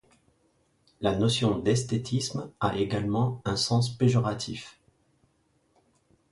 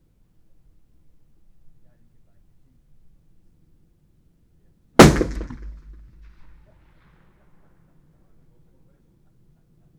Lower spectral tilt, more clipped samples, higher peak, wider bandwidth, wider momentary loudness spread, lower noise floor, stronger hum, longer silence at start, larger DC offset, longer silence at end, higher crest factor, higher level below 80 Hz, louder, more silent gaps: about the same, -5.5 dB/octave vs -5.5 dB/octave; neither; second, -10 dBFS vs 0 dBFS; second, 11.5 kHz vs over 20 kHz; second, 9 LU vs 30 LU; first, -69 dBFS vs -59 dBFS; neither; second, 1 s vs 5 s; neither; second, 1.6 s vs 4.3 s; second, 20 dB vs 26 dB; second, -54 dBFS vs -38 dBFS; second, -27 LUFS vs -15 LUFS; neither